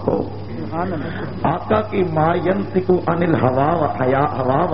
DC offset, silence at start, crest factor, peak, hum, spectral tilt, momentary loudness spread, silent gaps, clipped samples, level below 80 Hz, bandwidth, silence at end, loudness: 2%; 0 s; 16 dB; -4 dBFS; none; -7 dB/octave; 8 LU; none; under 0.1%; -42 dBFS; 5.8 kHz; 0 s; -19 LUFS